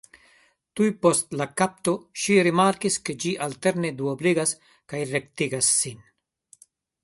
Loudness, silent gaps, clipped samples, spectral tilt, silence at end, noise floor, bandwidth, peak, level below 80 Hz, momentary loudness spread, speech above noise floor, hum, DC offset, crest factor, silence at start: -23 LUFS; none; under 0.1%; -4 dB/octave; 1.1 s; -61 dBFS; 12 kHz; -6 dBFS; -66 dBFS; 9 LU; 37 dB; none; under 0.1%; 20 dB; 0.75 s